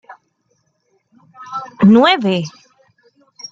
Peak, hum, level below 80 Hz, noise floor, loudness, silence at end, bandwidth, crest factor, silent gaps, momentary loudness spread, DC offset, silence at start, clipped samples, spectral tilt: 0 dBFS; none; -58 dBFS; -65 dBFS; -12 LUFS; 0.05 s; 7.6 kHz; 18 dB; none; 20 LU; under 0.1%; 0.1 s; under 0.1%; -6.5 dB/octave